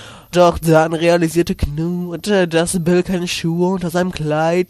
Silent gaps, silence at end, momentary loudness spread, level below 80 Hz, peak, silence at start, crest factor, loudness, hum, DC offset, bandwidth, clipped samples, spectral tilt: none; 0.05 s; 7 LU; -34 dBFS; 0 dBFS; 0 s; 16 dB; -16 LUFS; none; under 0.1%; 13.5 kHz; under 0.1%; -5.5 dB/octave